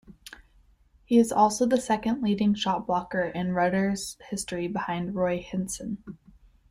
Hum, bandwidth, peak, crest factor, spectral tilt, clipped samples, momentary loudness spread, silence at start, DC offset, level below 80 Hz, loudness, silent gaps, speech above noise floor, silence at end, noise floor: none; 15 kHz; -8 dBFS; 18 dB; -5 dB/octave; under 0.1%; 13 LU; 0.1 s; under 0.1%; -56 dBFS; -27 LUFS; none; 34 dB; 0.55 s; -60 dBFS